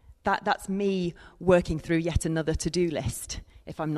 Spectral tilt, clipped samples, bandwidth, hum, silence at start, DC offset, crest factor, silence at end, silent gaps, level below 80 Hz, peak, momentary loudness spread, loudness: -5.5 dB/octave; under 0.1%; 13.5 kHz; none; 0.1 s; under 0.1%; 18 dB; 0 s; none; -42 dBFS; -10 dBFS; 12 LU; -28 LUFS